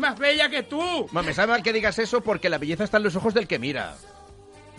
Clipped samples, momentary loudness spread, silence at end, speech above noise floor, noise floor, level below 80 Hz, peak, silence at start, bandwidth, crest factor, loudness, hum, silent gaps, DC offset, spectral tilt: under 0.1%; 6 LU; 0 s; 24 dB; -48 dBFS; -52 dBFS; -4 dBFS; 0 s; 11.5 kHz; 20 dB; -23 LUFS; none; none; under 0.1%; -4.5 dB/octave